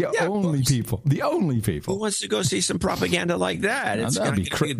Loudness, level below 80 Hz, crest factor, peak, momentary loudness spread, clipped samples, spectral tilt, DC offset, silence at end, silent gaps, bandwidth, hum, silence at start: -23 LUFS; -48 dBFS; 16 dB; -6 dBFS; 2 LU; under 0.1%; -4.5 dB/octave; under 0.1%; 0 s; none; 15.5 kHz; none; 0 s